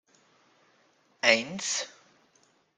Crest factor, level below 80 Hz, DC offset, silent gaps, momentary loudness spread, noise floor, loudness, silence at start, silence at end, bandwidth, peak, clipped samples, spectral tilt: 28 dB; -80 dBFS; under 0.1%; none; 10 LU; -67 dBFS; -26 LUFS; 1.25 s; 0.9 s; 10 kHz; -4 dBFS; under 0.1%; -1 dB/octave